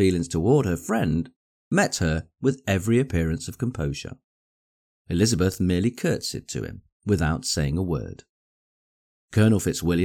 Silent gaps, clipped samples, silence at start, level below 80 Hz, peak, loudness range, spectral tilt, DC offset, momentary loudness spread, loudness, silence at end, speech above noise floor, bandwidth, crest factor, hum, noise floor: 1.36-1.71 s, 4.24-5.05 s, 6.92-7.00 s, 8.29-9.28 s; under 0.1%; 0 s; -42 dBFS; -8 dBFS; 3 LU; -5.5 dB/octave; under 0.1%; 11 LU; -24 LUFS; 0 s; over 67 dB; 17 kHz; 16 dB; none; under -90 dBFS